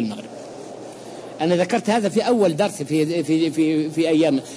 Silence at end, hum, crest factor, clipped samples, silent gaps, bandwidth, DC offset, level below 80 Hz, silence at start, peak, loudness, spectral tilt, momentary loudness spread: 0 s; none; 14 dB; under 0.1%; none; 11 kHz; under 0.1%; -66 dBFS; 0 s; -8 dBFS; -20 LUFS; -5.5 dB/octave; 18 LU